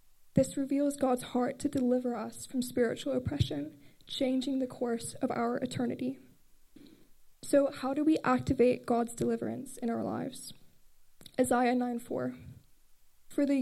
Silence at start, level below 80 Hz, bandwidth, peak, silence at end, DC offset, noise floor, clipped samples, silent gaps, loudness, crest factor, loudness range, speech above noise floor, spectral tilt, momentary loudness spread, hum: 0.2 s; -60 dBFS; 14.5 kHz; -12 dBFS; 0 s; under 0.1%; -59 dBFS; under 0.1%; none; -32 LUFS; 20 dB; 4 LU; 28 dB; -5.5 dB/octave; 12 LU; none